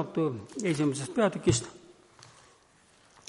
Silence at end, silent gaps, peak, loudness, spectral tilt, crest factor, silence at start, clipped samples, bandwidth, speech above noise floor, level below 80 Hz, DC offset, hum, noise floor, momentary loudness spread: 1 s; none; -10 dBFS; -29 LUFS; -5 dB/octave; 20 dB; 0 s; under 0.1%; 11.5 kHz; 33 dB; -58 dBFS; under 0.1%; none; -62 dBFS; 7 LU